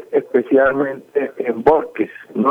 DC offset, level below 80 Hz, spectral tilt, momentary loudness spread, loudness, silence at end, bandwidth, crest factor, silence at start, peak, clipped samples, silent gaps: under 0.1%; -50 dBFS; -8.5 dB/octave; 9 LU; -18 LUFS; 0 s; 5.2 kHz; 16 dB; 0 s; -2 dBFS; under 0.1%; none